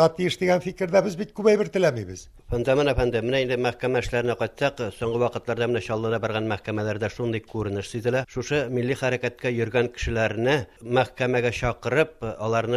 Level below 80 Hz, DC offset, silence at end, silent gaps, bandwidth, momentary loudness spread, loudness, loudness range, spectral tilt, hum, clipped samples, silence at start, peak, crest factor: -44 dBFS; under 0.1%; 0 s; none; 13.5 kHz; 7 LU; -25 LUFS; 3 LU; -6 dB/octave; none; under 0.1%; 0 s; -6 dBFS; 18 dB